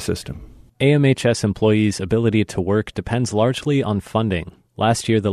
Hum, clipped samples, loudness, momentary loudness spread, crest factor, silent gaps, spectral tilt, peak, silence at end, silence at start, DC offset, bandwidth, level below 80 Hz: none; under 0.1%; -19 LUFS; 10 LU; 14 dB; none; -6 dB/octave; -4 dBFS; 0 s; 0 s; under 0.1%; 13.5 kHz; -44 dBFS